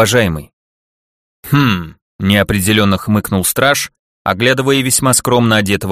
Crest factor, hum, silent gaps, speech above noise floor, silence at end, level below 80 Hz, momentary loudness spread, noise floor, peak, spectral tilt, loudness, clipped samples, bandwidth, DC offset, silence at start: 14 dB; none; 0.53-1.43 s, 2.02-2.19 s, 3.99-4.25 s; over 77 dB; 0 s; -40 dBFS; 9 LU; under -90 dBFS; 0 dBFS; -4 dB/octave; -13 LUFS; under 0.1%; 15.5 kHz; under 0.1%; 0 s